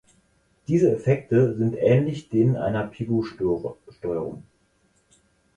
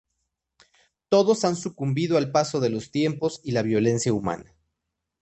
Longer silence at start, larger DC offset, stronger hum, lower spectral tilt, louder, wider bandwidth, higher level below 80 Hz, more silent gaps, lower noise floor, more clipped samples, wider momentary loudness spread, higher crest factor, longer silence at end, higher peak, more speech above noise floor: second, 0.7 s vs 1.1 s; neither; neither; first, -9 dB/octave vs -5.5 dB/octave; about the same, -23 LUFS vs -24 LUFS; about the same, 9.6 kHz vs 8.8 kHz; first, -54 dBFS vs -60 dBFS; neither; second, -65 dBFS vs -82 dBFS; neither; first, 14 LU vs 7 LU; about the same, 18 dB vs 18 dB; first, 1.15 s vs 0.8 s; about the same, -6 dBFS vs -6 dBFS; second, 43 dB vs 59 dB